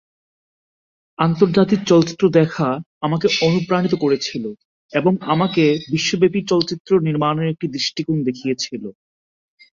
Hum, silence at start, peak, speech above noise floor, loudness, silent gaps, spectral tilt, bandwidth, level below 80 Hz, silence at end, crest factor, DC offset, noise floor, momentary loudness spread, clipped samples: none; 1.2 s; -2 dBFS; over 72 dB; -18 LUFS; 2.86-3.01 s, 4.65-4.89 s, 6.80-6.85 s; -6 dB/octave; 7.6 kHz; -56 dBFS; 0.85 s; 16 dB; under 0.1%; under -90 dBFS; 9 LU; under 0.1%